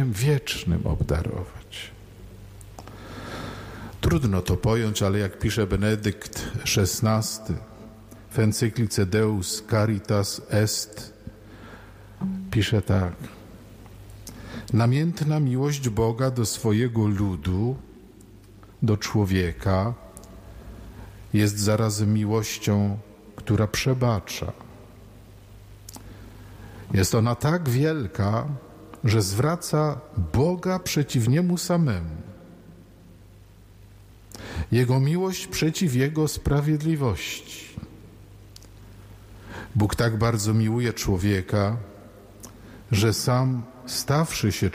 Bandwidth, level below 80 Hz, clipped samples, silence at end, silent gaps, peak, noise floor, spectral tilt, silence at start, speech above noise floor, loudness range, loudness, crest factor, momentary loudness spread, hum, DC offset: 16 kHz; -44 dBFS; under 0.1%; 0 s; none; -10 dBFS; -49 dBFS; -5.5 dB/octave; 0 s; 26 dB; 5 LU; -24 LUFS; 14 dB; 21 LU; none; under 0.1%